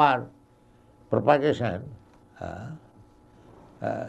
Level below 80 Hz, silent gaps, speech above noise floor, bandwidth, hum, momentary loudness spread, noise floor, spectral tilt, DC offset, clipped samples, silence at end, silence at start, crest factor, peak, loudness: -60 dBFS; none; 33 dB; 8.6 kHz; none; 23 LU; -57 dBFS; -7.5 dB/octave; under 0.1%; under 0.1%; 0 s; 0 s; 22 dB; -6 dBFS; -26 LUFS